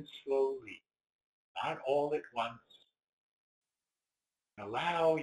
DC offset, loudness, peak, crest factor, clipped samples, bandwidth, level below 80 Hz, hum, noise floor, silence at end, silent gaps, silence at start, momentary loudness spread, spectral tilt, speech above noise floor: under 0.1%; -35 LUFS; -18 dBFS; 20 dB; under 0.1%; 11.5 kHz; -78 dBFS; none; under -90 dBFS; 0 s; 1.12-1.55 s, 3.09-3.62 s; 0 s; 18 LU; -5.5 dB/octave; over 56 dB